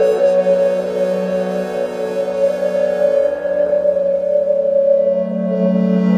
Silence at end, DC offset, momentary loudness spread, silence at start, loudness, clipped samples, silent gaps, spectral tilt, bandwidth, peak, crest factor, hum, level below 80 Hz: 0 s; under 0.1%; 6 LU; 0 s; -16 LUFS; under 0.1%; none; -8 dB/octave; 10 kHz; -4 dBFS; 12 dB; none; -56 dBFS